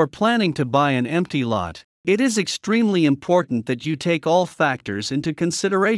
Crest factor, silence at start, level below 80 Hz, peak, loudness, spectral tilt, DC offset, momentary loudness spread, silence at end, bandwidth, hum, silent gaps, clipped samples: 16 dB; 0 s; -60 dBFS; -4 dBFS; -21 LUFS; -5 dB/octave; under 0.1%; 6 LU; 0 s; 12 kHz; none; 1.84-2.04 s; under 0.1%